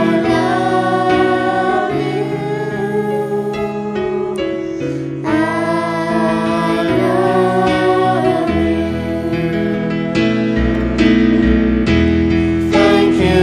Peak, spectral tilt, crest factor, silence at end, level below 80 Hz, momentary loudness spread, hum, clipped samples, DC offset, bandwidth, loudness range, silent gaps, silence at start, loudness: -2 dBFS; -7 dB/octave; 12 dB; 0 s; -30 dBFS; 8 LU; none; under 0.1%; under 0.1%; 12.5 kHz; 5 LU; none; 0 s; -15 LUFS